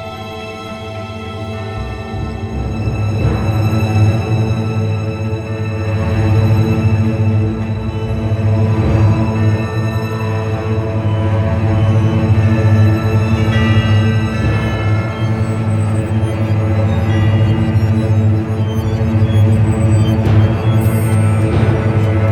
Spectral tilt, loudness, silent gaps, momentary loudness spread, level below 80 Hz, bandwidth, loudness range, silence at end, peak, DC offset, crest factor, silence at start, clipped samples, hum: -8 dB/octave; -15 LUFS; none; 10 LU; -30 dBFS; 12.5 kHz; 3 LU; 0 s; -2 dBFS; under 0.1%; 12 dB; 0 s; under 0.1%; none